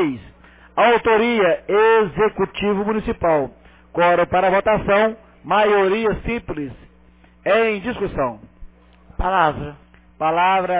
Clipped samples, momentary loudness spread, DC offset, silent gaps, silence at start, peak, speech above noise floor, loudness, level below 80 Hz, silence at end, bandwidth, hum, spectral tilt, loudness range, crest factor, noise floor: under 0.1%; 13 LU; under 0.1%; none; 0 s; -4 dBFS; 33 dB; -18 LUFS; -40 dBFS; 0 s; 4 kHz; none; -9.5 dB/octave; 5 LU; 16 dB; -50 dBFS